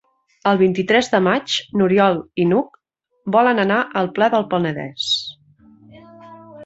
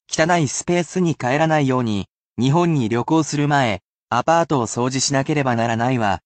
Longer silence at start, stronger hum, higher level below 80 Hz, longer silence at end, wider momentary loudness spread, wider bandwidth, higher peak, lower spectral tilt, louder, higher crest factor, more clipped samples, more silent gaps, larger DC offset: first, 0.45 s vs 0.1 s; neither; second, -60 dBFS vs -54 dBFS; about the same, 0 s vs 0.1 s; first, 8 LU vs 5 LU; second, 8 kHz vs 9 kHz; about the same, -2 dBFS vs -4 dBFS; about the same, -5.5 dB/octave vs -5 dB/octave; about the same, -18 LUFS vs -19 LUFS; about the same, 18 dB vs 14 dB; neither; second, none vs 2.09-2.36 s, 3.84-4.08 s; neither